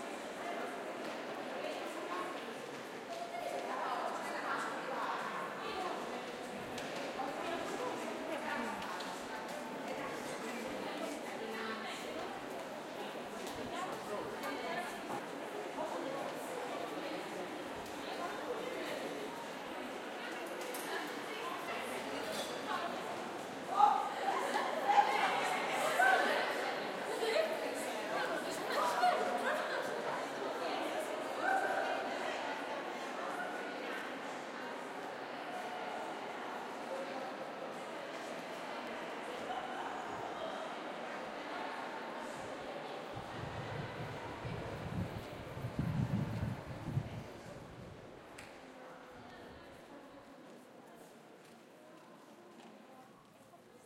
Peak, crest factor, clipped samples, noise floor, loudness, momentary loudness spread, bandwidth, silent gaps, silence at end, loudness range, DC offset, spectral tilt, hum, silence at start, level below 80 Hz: -14 dBFS; 26 dB; under 0.1%; -60 dBFS; -39 LUFS; 17 LU; 16.5 kHz; none; 0 s; 10 LU; under 0.1%; -4 dB/octave; none; 0 s; -68 dBFS